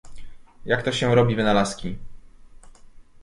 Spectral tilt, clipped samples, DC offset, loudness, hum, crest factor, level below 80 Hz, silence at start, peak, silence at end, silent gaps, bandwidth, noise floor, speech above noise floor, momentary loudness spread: -5.5 dB/octave; under 0.1%; under 0.1%; -22 LUFS; none; 18 dB; -44 dBFS; 0.05 s; -6 dBFS; 0.05 s; none; 11.5 kHz; -45 dBFS; 24 dB; 18 LU